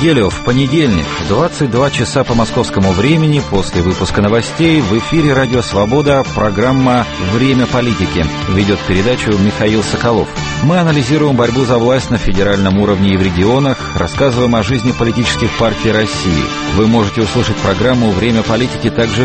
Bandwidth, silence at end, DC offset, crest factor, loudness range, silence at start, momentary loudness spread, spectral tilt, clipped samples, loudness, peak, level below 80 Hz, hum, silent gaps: 8.8 kHz; 0 s; under 0.1%; 12 dB; 1 LU; 0 s; 3 LU; -6 dB/octave; under 0.1%; -12 LUFS; 0 dBFS; -28 dBFS; none; none